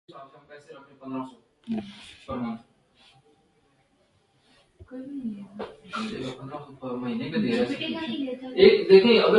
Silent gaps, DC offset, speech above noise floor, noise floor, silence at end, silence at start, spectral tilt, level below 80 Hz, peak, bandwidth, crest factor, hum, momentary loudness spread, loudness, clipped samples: none; under 0.1%; 41 dB; -66 dBFS; 0 s; 0.15 s; -6.5 dB/octave; -60 dBFS; -4 dBFS; 9.8 kHz; 22 dB; none; 25 LU; -24 LUFS; under 0.1%